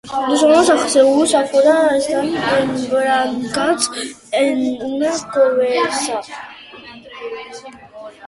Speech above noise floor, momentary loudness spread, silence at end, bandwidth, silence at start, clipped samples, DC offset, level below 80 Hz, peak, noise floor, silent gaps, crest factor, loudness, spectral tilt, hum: 22 dB; 22 LU; 0 s; 11.5 kHz; 0.05 s; under 0.1%; under 0.1%; -56 dBFS; -2 dBFS; -38 dBFS; none; 16 dB; -15 LUFS; -3 dB/octave; none